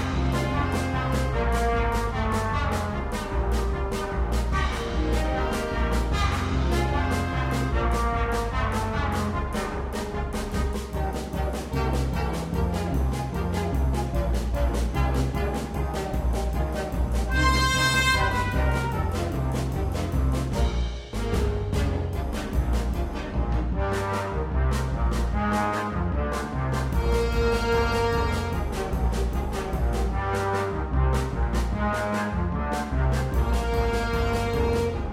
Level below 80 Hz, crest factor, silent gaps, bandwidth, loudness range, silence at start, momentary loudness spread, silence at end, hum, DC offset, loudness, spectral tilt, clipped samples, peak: -28 dBFS; 18 dB; none; 15 kHz; 4 LU; 0 s; 5 LU; 0 s; none; under 0.1%; -26 LUFS; -6 dB/octave; under 0.1%; -8 dBFS